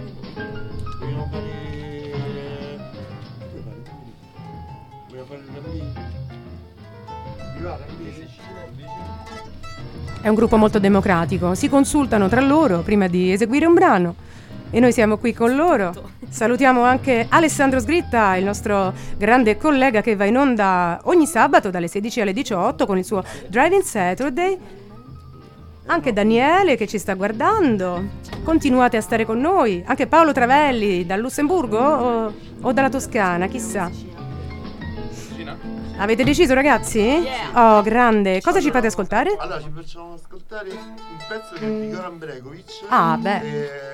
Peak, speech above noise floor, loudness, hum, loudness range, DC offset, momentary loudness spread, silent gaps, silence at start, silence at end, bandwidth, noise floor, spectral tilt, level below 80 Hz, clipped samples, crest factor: 0 dBFS; 24 dB; -18 LUFS; none; 18 LU; under 0.1%; 21 LU; none; 0 s; 0 s; 16.5 kHz; -41 dBFS; -5.5 dB/octave; -40 dBFS; under 0.1%; 18 dB